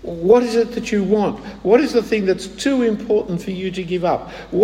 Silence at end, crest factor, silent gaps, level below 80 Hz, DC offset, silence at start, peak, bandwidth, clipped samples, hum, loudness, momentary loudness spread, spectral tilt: 0 s; 16 dB; none; -46 dBFS; under 0.1%; 0 s; -2 dBFS; 13.5 kHz; under 0.1%; none; -18 LUFS; 10 LU; -6 dB/octave